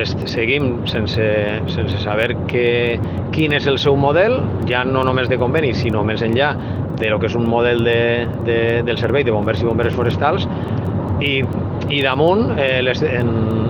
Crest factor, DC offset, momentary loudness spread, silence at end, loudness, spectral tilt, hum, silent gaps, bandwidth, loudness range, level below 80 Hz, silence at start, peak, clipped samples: 16 dB; under 0.1%; 5 LU; 0 s; -17 LUFS; -7.5 dB/octave; none; none; 8 kHz; 2 LU; -38 dBFS; 0 s; 0 dBFS; under 0.1%